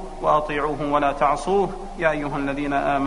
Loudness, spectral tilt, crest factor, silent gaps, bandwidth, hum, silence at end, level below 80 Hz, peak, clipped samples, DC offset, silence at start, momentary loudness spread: -22 LUFS; -6 dB/octave; 18 dB; none; 10.5 kHz; none; 0 s; -38 dBFS; -4 dBFS; under 0.1%; 0.3%; 0 s; 5 LU